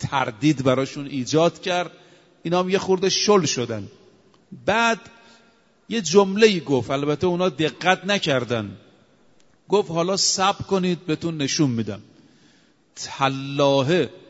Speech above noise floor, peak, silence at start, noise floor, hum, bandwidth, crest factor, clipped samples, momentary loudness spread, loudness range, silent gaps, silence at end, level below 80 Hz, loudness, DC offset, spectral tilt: 38 dB; 0 dBFS; 0 s; -59 dBFS; none; 8 kHz; 22 dB; under 0.1%; 11 LU; 3 LU; none; 0.1 s; -60 dBFS; -21 LUFS; under 0.1%; -4 dB/octave